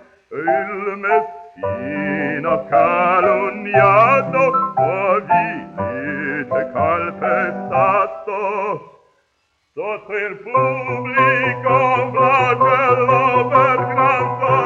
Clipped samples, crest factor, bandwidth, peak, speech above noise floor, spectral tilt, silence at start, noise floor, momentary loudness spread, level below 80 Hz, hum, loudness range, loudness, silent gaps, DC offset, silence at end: under 0.1%; 16 dB; 7.4 kHz; -2 dBFS; 50 dB; -7.5 dB/octave; 0.3 s; -66 dBFS; 10 LU; -58 dBFS; none; 6 LU; -17 LUFS; none; under 0.1%; 0 s